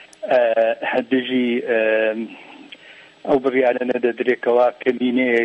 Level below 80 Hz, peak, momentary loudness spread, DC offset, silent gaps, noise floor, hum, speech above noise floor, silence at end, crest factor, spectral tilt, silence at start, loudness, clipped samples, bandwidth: -66 dBFS; -6 dBFS; 8 LU; under 0.1%; none; -45 dBFS; none; 27 dB; 0 s; 14 dB; -6 dB/octave; 0 s; -19 LUFS; under 0.1%; 8.8 kHz